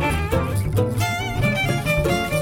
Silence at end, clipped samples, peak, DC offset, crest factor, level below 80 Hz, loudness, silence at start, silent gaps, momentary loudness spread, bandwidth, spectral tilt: 0 s; under 0.1%; -6 dBFS; under 0.1%; 14 dB; -32 dBFS; -21 LUFS; 0 s; none; 2 LU; 17 kHz; -5.5 dB/octave